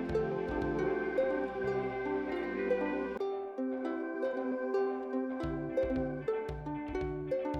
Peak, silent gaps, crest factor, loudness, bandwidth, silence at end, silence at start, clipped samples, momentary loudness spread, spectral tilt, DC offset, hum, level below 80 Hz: -20 dBFS; none; 14 dB; -35 LUFS; 7.4 kHz; 0 s; 0 s; under 0.1%; 5 LU; -8 dB/octave; under 0.1%; none; -52 dBFS